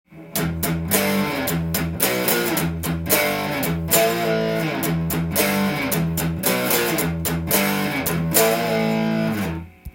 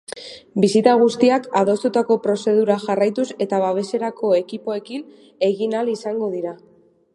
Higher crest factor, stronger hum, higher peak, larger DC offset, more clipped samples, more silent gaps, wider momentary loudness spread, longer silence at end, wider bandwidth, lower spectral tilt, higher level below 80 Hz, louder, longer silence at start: about the same, 20 dB vs 18 dB; neither; about the same, -2 dBFS vs 0 dBFS; neither; neither; neither; second, 6 LU vs 13 LU; second, 0.05 s vs 0.6 s; first, 17 kHz vs 11.5 kHz; second, -4 dB/octave vs -6 dB/octave; first, -44 dBFS vs -68 dBFS; about the same, -20 LUFS vs -19 LUFS; about the same, 0.1 s vs 0.1 s